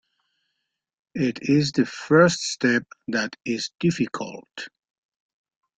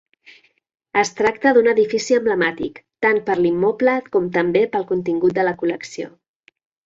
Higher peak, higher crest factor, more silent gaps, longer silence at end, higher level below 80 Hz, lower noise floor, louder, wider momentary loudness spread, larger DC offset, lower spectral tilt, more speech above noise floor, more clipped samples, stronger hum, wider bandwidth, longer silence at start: about the same, -2 dBFS vs -2 dBFS; first, 22 dB vs 16 dB; neither; first, 1.1 s vs 0.75 s; about the same, -62 dBFS vs -60 dBFS; first, -80 dBFS vs -50 dBFS; second, -23 LUFS vs -18 LUFS; first, 19 LU vs 12 LU; neither; about the same, -5 dB/octave vs -5 dB/octave; first, 57 dB vs 32 dB; neither; neither; first, 9.4 kHz vs 7.8 kHz; first, 1.15 s vs 0.95 s